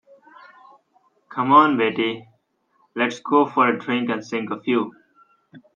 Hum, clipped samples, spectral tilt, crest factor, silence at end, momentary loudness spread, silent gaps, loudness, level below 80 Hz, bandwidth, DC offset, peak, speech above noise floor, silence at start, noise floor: none; under 0.1%; -5.5 dB/octave; 22 dB; 0.2 s; 15 LU; none; -20 LUFS; -72 dBFS; 7.4 kHz; under 0.1%; 0 dBFS; 46 dB; 1.3 s; -66 dBFS